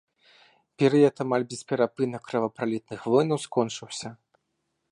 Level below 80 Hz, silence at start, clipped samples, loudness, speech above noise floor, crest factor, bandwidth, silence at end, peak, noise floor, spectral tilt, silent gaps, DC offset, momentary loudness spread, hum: -74 dBFS; 0.8 s; under 0.1%; -26 LUFS; 52 dB; 18 dB; 11 kHz; 0.75 s; -8 dBFS; -78 dBFS; -6 dB/octave; none; under 0.1%; 12 LU; none